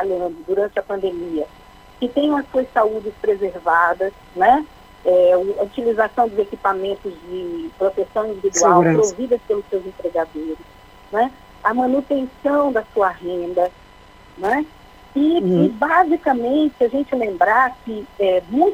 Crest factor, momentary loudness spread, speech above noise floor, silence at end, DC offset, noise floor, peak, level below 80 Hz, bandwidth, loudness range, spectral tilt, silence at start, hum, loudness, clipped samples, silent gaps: 18 dB; 11 LU; 27 dB; 0 s; under 0.1%; -45 dBFS; 0 dBFS; -50 dBFS; 15 kHz; 4 LU; -5 dB/octave; 0 s; none; -19 LUFS; under 0.1%; none